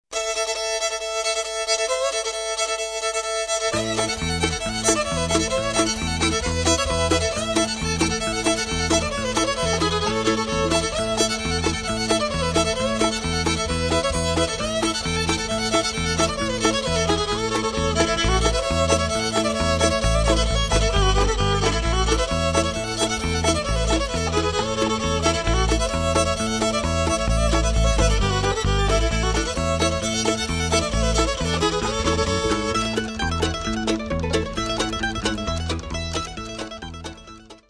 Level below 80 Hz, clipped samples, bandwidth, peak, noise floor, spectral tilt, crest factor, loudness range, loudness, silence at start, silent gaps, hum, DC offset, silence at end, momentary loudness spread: -30 dBFS; under 0.1%; 11 kHz; -4 dBFS; -43 dBFS; -3.5 dB/octave; 18 dB; 3 LU; -22 LUFS; 0.1 s; none; none; under 0.1%; 0.15 s; 4 LU